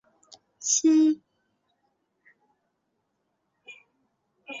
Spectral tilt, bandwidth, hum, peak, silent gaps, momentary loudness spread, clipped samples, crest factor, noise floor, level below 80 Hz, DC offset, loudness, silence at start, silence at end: -1 dB/octave; 7.8 kHz; none; -10 dBFS; none; 15 LU; under 0.1%; 20 dB; -77 dBFS; -80 dBFS; under 0.1%; -23 LUFS; 0.6 s; 0 s